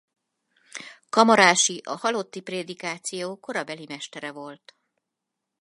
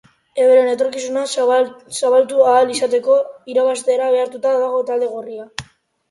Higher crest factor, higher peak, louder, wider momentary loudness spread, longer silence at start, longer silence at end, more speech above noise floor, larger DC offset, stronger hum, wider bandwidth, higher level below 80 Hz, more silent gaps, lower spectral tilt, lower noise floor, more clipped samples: first, 26 dB vs 14 dB; about the same, 0 dBFS vs -2 dBFS; second, -23 LUFS vs -16 LUFS; first, 24 LU vs 13 LU; first, 0.75 s vs 0.35 s; first, 1.05 s vs 0.45 s; first, 60 dB vs 28 dB; neither; neither; about the same, 11.5 kHz vs 11.5 kHz; second, -74 dBFS vs -62 dBFS; neither; about the same, -2 dB/octave vs -3 dB/octave; first, -84 dBFS vs -44 dBFS; neither